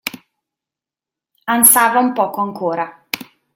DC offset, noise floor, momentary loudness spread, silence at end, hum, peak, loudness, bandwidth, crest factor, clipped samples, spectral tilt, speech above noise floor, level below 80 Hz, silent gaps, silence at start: under 0.1%; -88 dBFS; 18 LU; 0.35 s; none; 0 dBFS; -14 LUFS; 17 kHz; 18 dB; under 0.1%; -2 dB/octave; 73 dB; -66 dBFS; none; 0.05 s